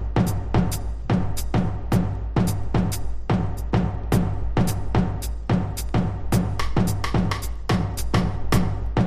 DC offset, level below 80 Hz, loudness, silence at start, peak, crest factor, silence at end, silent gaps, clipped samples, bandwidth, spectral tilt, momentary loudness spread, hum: under 0.1%; -28 dBFS; -24 LUFS; 0 s; -6 dBFS; 16 dB; 0 s; none; under 0.1%; 15.5 kHz; -6.5 dB/octave; 2 LU; none